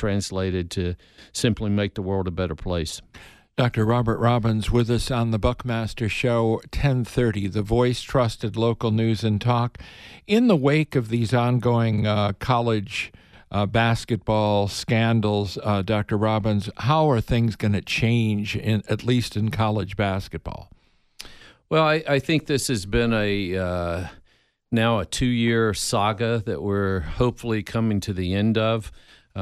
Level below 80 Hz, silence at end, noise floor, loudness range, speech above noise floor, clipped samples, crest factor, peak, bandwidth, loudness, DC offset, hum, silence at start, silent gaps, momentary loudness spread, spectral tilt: -40 dBFS; 0 s; -61 dBFS; 3 LU; 39 dB; under 0.1%; 18 dB; -6 dBFS; 13.5 kHz; -23 LUFS; under 0.1%; none; 0 s; none; 8 LU; -6 dB/octave